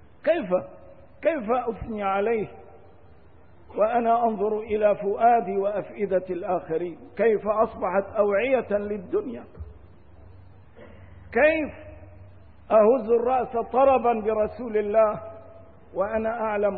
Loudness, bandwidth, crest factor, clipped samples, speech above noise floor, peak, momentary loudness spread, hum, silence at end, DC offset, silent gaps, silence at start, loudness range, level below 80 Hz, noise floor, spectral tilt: -24 LUFS; 4.4 kHz; 18 dB; under 0.1%; 30 dB; -8 dBFS; 14 LU; none; 0 s; 0.3%; none; 0.25 s; 6 LU; -54 dBFS; -53 dBFS; -10.5 dB/octave